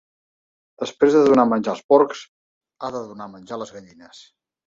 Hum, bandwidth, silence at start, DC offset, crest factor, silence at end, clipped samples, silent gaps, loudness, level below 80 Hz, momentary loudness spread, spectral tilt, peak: none; 7.6 kHz; 0.8 s; under 0.1%; 20 dB; 0.85 s; under 0.1%; 1.84-1.89 s, 2.28-2.61 s; -18 LUFS; -64 dBFS; 21 LU; -6 dB/octave; -2 dBFS